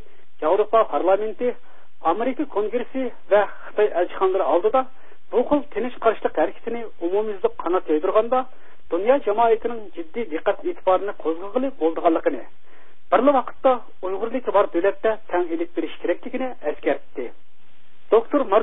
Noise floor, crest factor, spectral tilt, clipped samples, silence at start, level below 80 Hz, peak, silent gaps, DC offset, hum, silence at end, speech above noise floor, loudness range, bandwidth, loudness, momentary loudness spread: -60 dBFS; 18 dB; -9.5 dB/octave; under 0.1%; 0.4 s; -60 dBFS; -4 dBFS; none; 4%; none; 0 s; 39 dB; 2 LU; 3.9 kHz; -22 LUFS; 10 LU